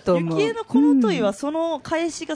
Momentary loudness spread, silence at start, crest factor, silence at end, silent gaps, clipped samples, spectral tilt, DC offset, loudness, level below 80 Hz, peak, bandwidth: 7 LU; 0.05 s; 14 dB; 0 s; none; under 0.1%; -6 dB/octave; under 0.1%; -21 LUFS; -58 dBFS; -8 dBFS; 10.5 kHz